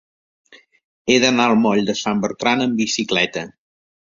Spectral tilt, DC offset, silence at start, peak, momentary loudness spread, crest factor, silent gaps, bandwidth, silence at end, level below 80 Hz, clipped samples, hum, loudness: -3.5 dB/octave; under 0.1%; 1.05 s; 0 dBFS; 9 LU; 20 dB; none; 7.6 kHz; 0.6 s; -58 dBFS; under 0.1%; none; -18 LUFS